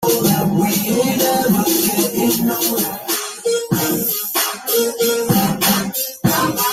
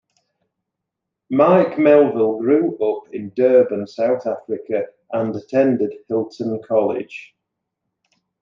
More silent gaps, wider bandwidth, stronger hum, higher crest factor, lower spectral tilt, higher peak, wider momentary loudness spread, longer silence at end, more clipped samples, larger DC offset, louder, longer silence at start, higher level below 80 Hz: neither; first, 16.5 kHz vs 7.2 kHz; neither; about the same, 16 dB vs 18 dB; second, -4 dB/octave vs -8.5 dB/octave; about the same, -2 dBFS vs -2 dBFS; second, 5 LU vs 12 LU; second, 0 s vs 1.15 s; neither; neither; about the same, -16 LUFS vs -18 LUFS; second, 0 s vs 1.3 s; first, -50 dBFS vs -70 dBFS